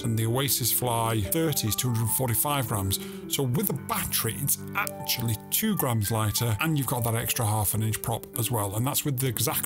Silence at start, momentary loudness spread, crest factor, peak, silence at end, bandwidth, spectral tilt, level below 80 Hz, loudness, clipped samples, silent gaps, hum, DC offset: 0 s; 4 LU; 24 dB; -4 dBFS; 0 s; 19 kHz; -4 dB/octave; -54 dBFS; -26 LUFS; under 0.1%; none; none; under 0.1%